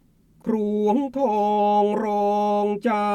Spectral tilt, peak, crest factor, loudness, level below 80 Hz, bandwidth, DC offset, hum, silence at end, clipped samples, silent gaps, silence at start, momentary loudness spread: -7.5 dB/octave; -10 dBFS; 12 dB; -22 LUFS; -60 dBFS; 12 kHz; under 0.1%; none; 0 s; under 0.1%; none; 0.45 s; 5 LU